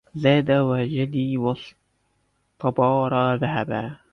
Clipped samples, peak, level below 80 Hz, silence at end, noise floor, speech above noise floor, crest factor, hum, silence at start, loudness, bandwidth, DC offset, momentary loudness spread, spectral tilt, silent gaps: under 0.1%; -6 dBFS; -58 dBFS; 0.15 s; -69 dBFS; 47 dB; 18 dB; none; 0.15 s; -22 LUFS; 6.4 kHz; under 0.1%; 9 LU; -9 dB/octave; none